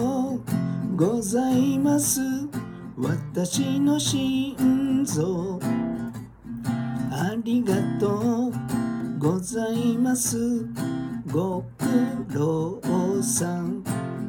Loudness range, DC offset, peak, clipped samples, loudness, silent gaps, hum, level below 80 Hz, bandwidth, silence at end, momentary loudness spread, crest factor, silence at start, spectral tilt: 2 LU; under 0.1%; -8 dBFS; under 0.1%; -25 LUFS; none; none; -54 dBFS; 19 kHz; 0 s; 8 LU; 16 dB; 0 s; -5.5 dB/octave